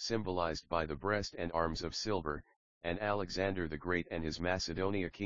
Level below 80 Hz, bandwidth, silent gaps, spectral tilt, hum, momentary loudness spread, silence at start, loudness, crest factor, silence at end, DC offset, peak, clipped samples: -54 dBFS; 7.4 kHz; 2.56-2.81 s; -4 dB/octave; none; 4 LU; 0 s; -37 LUFS; 20 dB; 0 s; 0.2%; -16 dBFS; under 0.1%